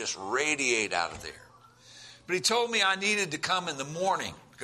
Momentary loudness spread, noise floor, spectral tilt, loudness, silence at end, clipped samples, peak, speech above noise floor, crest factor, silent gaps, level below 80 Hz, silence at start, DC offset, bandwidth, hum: 15 LU; -55 dBFS; -1.5 dB/octave; -28 LUFS; 0 s; under 0.1%; -12 dBFS; 25 dB; 18 dB; none; -66 dBFS; 0 s; under 0.1%; 14 kHz; none